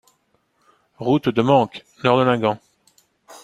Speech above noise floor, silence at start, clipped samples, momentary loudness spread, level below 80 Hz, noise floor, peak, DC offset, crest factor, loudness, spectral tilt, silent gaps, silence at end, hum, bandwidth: 48 dB; 1 s; under 0.1%; 11 LU; -60 dBFS; -66 dBFS; -2 dBFS; under 0.1%; 20 dB; -19 LUFS; -7 dB/octave; none; 0.05 s; none; 13 kHz